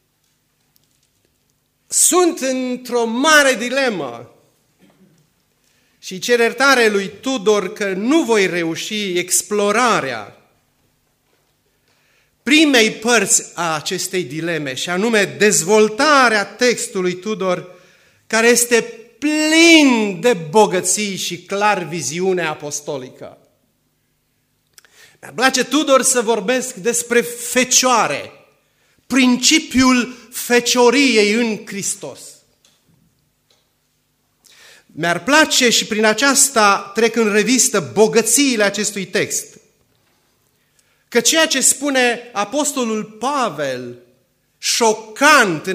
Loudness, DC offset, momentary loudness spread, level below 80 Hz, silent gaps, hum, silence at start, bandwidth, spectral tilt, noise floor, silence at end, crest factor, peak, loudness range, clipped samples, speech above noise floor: -15 LUFS; under 0.1%; 11 LU; -58 dBFS; none; none; 1.9 s; 16 kHz; -2 dB/octave; -65 dBFS; 0 s; 18 dB; 0 dBFS; 7 LU; under 0.1%; 49 dB